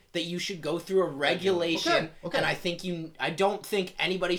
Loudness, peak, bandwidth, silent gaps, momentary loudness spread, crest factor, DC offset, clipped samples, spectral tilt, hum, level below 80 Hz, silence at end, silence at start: -28 LUFS; -10 dBFS; 18 kHz; none; 7 LU; 18 dB; under 0.1%; under 0.1%; -4.5 dB/octave; none; -58 dBFS; 0 s; 0.15 s